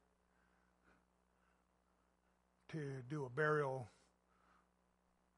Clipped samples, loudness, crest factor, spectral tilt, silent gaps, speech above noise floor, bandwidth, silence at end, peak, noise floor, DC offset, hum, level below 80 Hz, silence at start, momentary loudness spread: under 0.1%; -43 LUFS; 24 dB; -7 dB/octave; none; 38 dB; 11.5 kHz; 1.5 s; -26 dBFS; -80 dBFS; under 0.1%; none; -82 dBFS; 2.7 s; 14 LU